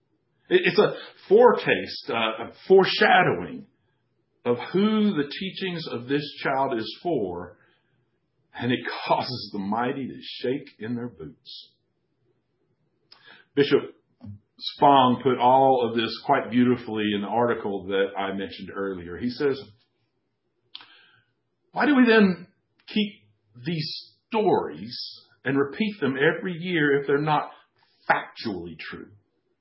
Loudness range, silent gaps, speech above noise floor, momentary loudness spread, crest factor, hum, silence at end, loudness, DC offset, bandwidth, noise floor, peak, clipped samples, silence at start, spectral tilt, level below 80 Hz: 9 LU; none; 52 dB; 19 LU; 22 dB; none; 0.55 s; -24 LUFS; under 0.1%; 5.8 kHz; -76 dBFS; -2 dBFS; under 0.1%; 0.5 s; -10 dB/octave; -64 dBFS